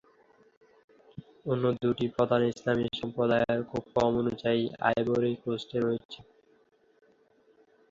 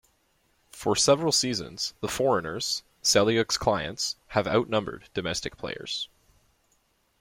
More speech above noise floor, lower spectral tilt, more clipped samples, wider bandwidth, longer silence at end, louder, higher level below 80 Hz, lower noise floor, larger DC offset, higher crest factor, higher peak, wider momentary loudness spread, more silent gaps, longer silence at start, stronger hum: second, 36 dB vs 42 dB; first, -7 dB/octave vs -3 dB/octave; neither; second, 7.6 kHz vs 16.5 kHz; first, 1.7 s vs 1.15 s; second, -29 LUFS vs -26 LUFS; about the same, -60 dBFS vs -56 dBFS; second, -64 dBFS vs -69 dBFS; neither; about the same, 20 dB vs 20 dB; about the same, -10 dBFS vs -8 dBFS; about the same, 13 LU vs 11 LU; first, 6.05-6.09 s vs none; first, 1.2 s vs 0.75 s; neither